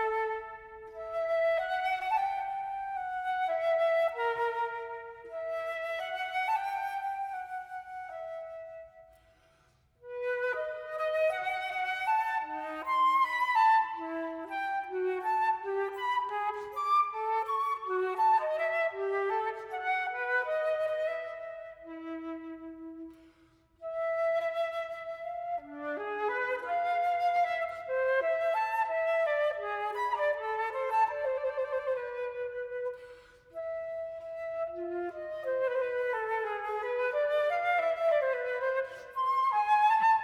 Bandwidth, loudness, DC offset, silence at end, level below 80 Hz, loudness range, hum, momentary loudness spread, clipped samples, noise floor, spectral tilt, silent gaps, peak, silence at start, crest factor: 14.5 kHz; -31 LUFS; under 0.1%; 0 s; -72 dBFS; 8 LU; none; 13 LU; under 0.1%; -67 dBFS; -3.5 dB/octave; none; -16 dBFS; 0 s; 16 dB